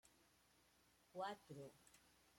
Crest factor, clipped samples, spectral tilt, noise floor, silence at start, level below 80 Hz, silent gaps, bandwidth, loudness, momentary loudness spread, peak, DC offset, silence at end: 22 dB; under 0.1%; -4.5 dB/octave; -77 dBFS; 0.05 s; -88 dBFS; none; 16 kHz; -54 LUFS; 12 LU; -36 dBFS; under 0.1%; 0 s